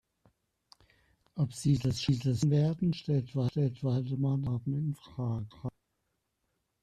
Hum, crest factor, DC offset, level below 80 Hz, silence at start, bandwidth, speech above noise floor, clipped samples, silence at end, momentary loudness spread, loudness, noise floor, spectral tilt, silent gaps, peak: none; 16 dB; under 0.1%; -60 dBFS; 1.35 s; 10.5 kHz; 51 dB; under 0.1%; 1.15 s; 9 LU; -32 LUFS; -81 dBFS; -7.5 dB/octave; none; -16 dBFS